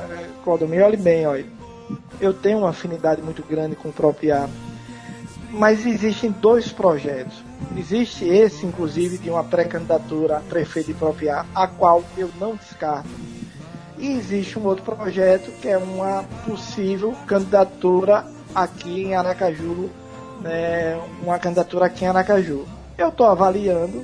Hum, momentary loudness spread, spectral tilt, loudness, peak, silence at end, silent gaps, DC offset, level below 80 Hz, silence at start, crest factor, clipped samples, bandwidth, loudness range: none; 17 LU; -6.5 dB/octave; -21 LUFS; 0 dBFS; 0 s; none; under 0.1%; -50 dBFS; 0 s; 20 dB; under 0.1%; 10.5 kHz; 3 LU